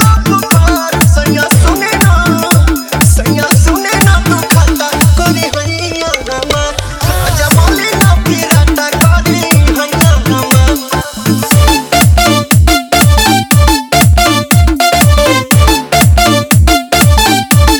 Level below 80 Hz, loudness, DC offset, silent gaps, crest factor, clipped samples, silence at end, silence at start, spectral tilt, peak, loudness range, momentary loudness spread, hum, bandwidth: -14 dBFS; -8 LUFS; under 0.1%; none; 8 dB; 1%; 0 s; 0 s; -4.5 dB/octave; 0 dBFS; 3 LU; 6 LU; none; over 20 kHz